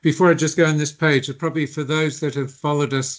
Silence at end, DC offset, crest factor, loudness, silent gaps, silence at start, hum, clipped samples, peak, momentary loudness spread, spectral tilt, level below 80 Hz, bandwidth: 0 s; under 0.1%; 18 dB; -20 LUFS; none; 0.05 s; none; under 0.1%; -2 dBFS; 8 LU; -5 dB/octave; -64 dBFS; 8 kHz